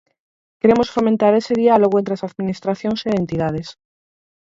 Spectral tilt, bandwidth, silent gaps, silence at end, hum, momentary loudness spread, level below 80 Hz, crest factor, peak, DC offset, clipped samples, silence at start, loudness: -7 dB/octave; 7.8 kHz; none; 0.85 s; none; 10 LU; -50 dBFS; 18 dB; -2 dBFS; under 0.1%; under 0.1%; 0.65 s; -18 LUFS